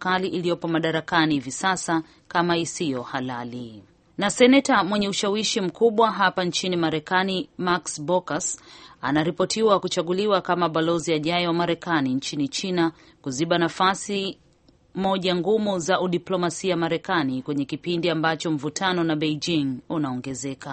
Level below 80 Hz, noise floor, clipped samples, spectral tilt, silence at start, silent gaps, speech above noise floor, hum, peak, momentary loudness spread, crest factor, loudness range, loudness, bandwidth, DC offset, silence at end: -60 dBFS; -58 dBFS; under 0.1%; -4.5 dB/octave; 0 s; none; 35 dB; none; -4 dBFS; 8 LU; 20 dB; 4 LU; -23 LUFS; 8.8 kHz; under 0.1%; 0 s